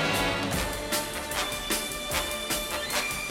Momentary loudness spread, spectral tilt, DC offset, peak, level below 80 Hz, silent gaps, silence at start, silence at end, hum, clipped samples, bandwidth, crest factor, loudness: 3 LU; -2.5 dB/octave; under 0.1%; -12 dBFS; -44 dBFS; none; 0 s; 0 s; none; under 0.1%; 17 kHz; 18 dB; -28 LUFS